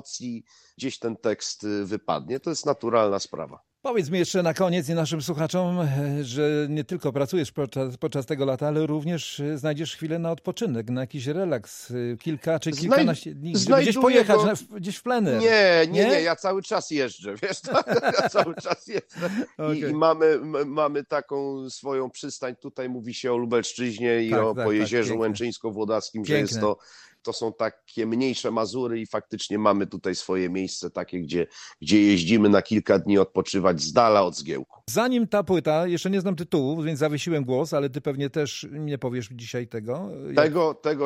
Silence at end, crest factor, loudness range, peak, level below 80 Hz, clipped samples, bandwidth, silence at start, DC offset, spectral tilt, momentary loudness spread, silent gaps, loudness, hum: 0 s; 20 dB; 7 LU; -4 dBFS; -64 dBFS; under 0.1%; 15.5 kHz; 0.05 s; under 0.1%; -5.5 dB/octave; 13 LU; none; -25 LUFS; none